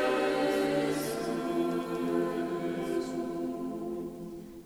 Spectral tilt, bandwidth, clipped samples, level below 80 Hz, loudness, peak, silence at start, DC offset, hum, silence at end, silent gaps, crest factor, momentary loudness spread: -5.5 dB/octave; over 20 kHz; under 0.1%; -62 dBFS; -32 LUFS; -16 dBFS; 0 s; under 0.1%; none; 0 s; none; 16 dB; 9 LU